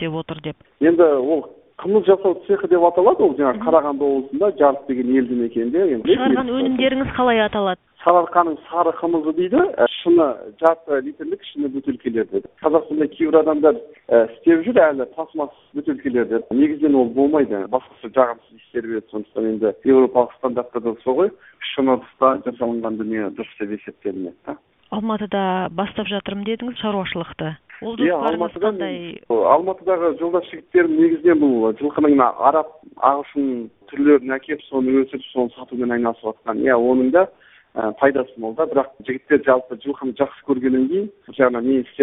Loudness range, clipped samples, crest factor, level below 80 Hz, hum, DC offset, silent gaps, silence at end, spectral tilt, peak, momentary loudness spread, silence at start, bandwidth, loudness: 6 LU; under 0.1%; 18 dB; -56 dBFS; none; under 0.1%; none; 0 s; -9.5 dB/octave; 0 dBFS; 13 LU; 0 s; 3.9 kHz; -19 LUFS